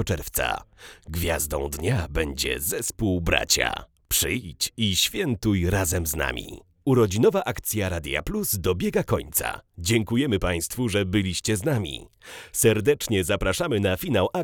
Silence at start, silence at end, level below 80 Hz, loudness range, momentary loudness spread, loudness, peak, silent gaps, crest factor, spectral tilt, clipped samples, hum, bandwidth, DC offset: 0 s; 0 s; -40 dBFS; 2 LU; 8 LU; -24 LUFS; -4 dBFS; none; 20 dB; -4 dB/octave; under 0.1%; none; over 20 kHz; under 0.1%